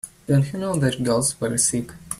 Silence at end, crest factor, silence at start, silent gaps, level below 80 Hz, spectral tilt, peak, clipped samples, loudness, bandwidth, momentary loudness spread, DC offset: 0.05 s; 16 dB; 0.05 s; none; -50 dBFS; -4.5 dB/octave; -6 dBFS; under 0.1%; -21 LUFS; 14.5 kHz; 3 LU; under 0.1%